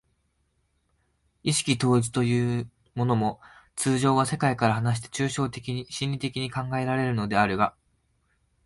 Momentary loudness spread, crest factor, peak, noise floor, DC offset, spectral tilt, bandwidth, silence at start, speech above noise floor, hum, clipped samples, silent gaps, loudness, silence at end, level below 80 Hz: 9 LU; 20 dB; -8 dBFS; -71 dBFS; under 0.1%; -5 dB/octave; 11.5 kHz; 1.45 s; 46 dB; none; under 0.1%; none; -26 LUFS; 0.95 s; -56 dBFS